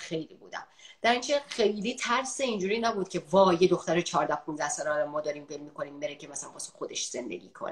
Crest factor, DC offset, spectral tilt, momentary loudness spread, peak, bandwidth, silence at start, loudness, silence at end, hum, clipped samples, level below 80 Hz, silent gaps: 20 dB; under 0.1%; -3.5 dB/octave; 15 LU; -10 dBFS; 12 kHz; 0 s; -29 LUFS; 0 s; none; under 0.1%; -68 dBFS; none